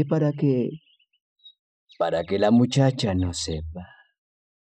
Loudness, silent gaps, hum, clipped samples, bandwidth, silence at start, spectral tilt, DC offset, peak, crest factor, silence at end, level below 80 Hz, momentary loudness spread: -23 LUFS; 1.20-1.36 s, 1.59-1.87 s; none; under 0.1%; 9.8 kHz; 0 s; -6.5 dB/octave; under 0.1%; -6 dBFS; 18 dB; 0.85 s; -48 dBFS; 15 LU